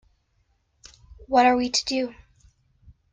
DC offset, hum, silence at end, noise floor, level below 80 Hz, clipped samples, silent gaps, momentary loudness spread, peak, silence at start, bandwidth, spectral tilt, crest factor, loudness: under 0.1%; none; 1 s; -68 dBFS; -54 dBFS; under 0.1%; none; 10 LU; -6 dBFS; 1.3 s; 9.6 kHz; -2 dB/octave; 20 dB; -22 LUFS